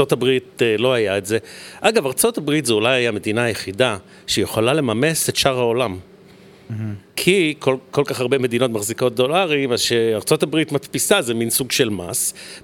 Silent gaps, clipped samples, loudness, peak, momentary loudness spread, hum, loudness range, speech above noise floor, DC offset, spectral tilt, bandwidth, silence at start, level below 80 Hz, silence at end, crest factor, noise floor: none; under 0.1%; -19 LUFS; 0 dBFS; 6 LU; none; 2 LU; 26 dB; under 0.1%; -3.5 dB/octave; 19 kHz; 0 s; -56 dBFS; 0.05 s; 18 dB; -45 dBFS